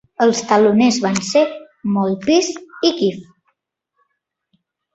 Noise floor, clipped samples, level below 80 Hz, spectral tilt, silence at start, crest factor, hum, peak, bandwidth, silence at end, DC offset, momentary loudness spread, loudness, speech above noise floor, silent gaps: -74 dBFS; under 0.1%; -60 dBFS; -4.5 dB/octave; 0.2 s; 16 dB; none; -2 dBFS; 8.2 kHz; 1.7 s; under 0.1%; 8 LU; -17 LUFS; 59 dB; none